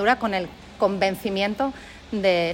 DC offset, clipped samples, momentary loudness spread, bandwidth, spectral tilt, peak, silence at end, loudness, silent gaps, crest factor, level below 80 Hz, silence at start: under 0.1%; under 0.1%; 11 LU; 16.5 kHz; -5.5 dB/octave; -6 dBFS; 0 s; -24 LUFS; none; 16 dB; -50 dBFS; 0 s